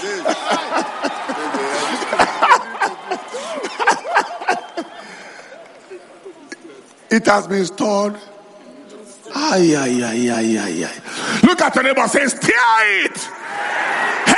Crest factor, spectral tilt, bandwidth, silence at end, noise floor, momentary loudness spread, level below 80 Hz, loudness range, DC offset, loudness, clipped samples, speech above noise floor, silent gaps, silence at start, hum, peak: 18 dB; -3.5 dB/octave; 11.5 kHz; 0 s; -41 dBFS; 21 LU; -58 dBFS; 7 LU; under 0.1%; -17 LUFS; under 0.1%; 25 dB; none; 0 s; none; 0 dBFS